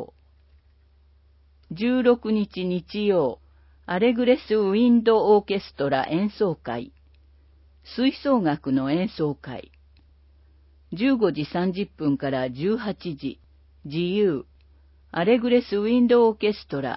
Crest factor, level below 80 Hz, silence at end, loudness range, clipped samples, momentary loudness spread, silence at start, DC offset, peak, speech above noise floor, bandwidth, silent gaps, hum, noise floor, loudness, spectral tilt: 18 dB; -54 dBFS; 0 s; 6 LU; under 0.1%; 14 LU; 0 s; under 0.1%; -6 dBFS; 35 dB; 5.8 kHz; none; none; -57 dBFS; -23 LUFS; -11 dB/octave